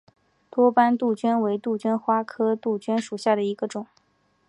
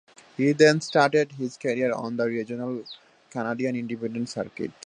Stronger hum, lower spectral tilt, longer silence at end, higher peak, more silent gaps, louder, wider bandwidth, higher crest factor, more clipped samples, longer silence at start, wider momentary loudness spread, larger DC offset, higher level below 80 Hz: neither; about the same, -6 dB/octave vs -5.5 dB/octave; first, 0.65 s vs 0.15 s; about the same, -6 dBFS vs -4 dBFS; neither; about the same, -24 LUFS vs -25 LUFS; about the same, 11 kHz vs 10 kHz; about the same, 18 dB vs 22 dB; neither; first, 0.55 s vs 0.4 s; second, 11 LU vs 16 LU; neither; second, -78 dBFS vs -70 dBFS